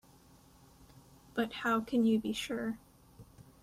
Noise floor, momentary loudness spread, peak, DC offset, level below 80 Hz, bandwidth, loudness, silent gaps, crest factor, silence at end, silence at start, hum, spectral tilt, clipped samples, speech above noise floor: -61 dBFS; 11 LU; -20 dBFS; under 0.1%; -66 dBFS; 15.5 kHz; -33 LUFS; none; 16 dB; 0.2 s; 0.8 s; none; -5 dB/octave; under 0.1%; 29 dB